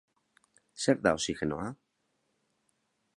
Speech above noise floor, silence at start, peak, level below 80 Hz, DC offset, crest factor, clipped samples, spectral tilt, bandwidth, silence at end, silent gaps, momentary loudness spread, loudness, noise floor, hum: 48 dB; 0.75 s; -10 dBFS; -60 dBFS; under 0.1%; 26 dB; under 0.1%; -4 dB/octave; 11.5 kHz; 1.4 s; none; 14 LU; -31 LUFS; -78 dBFS; none